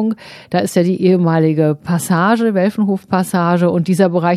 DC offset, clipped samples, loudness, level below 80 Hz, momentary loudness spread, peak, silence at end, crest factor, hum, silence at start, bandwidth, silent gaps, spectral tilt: under 0.1%; under 0.1%; -15 LUFS; -60 dBFS; 6 LU; 0 dBFS; 0 s; 14 dB; none; 0 s; 14 kHz; none; -7 dB/octave